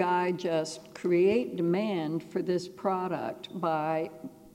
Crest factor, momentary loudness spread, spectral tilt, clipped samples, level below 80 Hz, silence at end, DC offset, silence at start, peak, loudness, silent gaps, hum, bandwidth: 16 dB; 10 LU; -6.5 dB/octave; under 0.1%; -72 dBFS; 0.05 s; under 0.1%; 0 s; -14 dBFS; -30 LUFS; none; none; 15 kHz